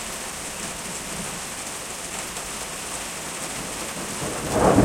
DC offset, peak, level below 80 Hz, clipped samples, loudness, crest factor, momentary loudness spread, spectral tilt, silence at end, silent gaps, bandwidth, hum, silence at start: under 0.1%; -6 dBFS; -46 dBFS; under 0.1%; -28 LUFS; 22 dB; 4 LU; -3.5 dB/octave; 0 s; none; 16.5 kHz; none; 0 s